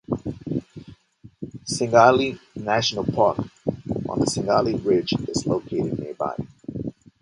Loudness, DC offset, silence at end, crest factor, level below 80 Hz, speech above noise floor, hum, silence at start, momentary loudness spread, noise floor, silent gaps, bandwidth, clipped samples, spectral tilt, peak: -23 LUFS; under 0.1%; 0.3 s; 22 dB; -50 dBFS; 28 dB; none; 0.1 s; 16 LU; -50 dBFS; none; 11.5 kHz; under 0.1%; -5 dB/octave; 0 dBFS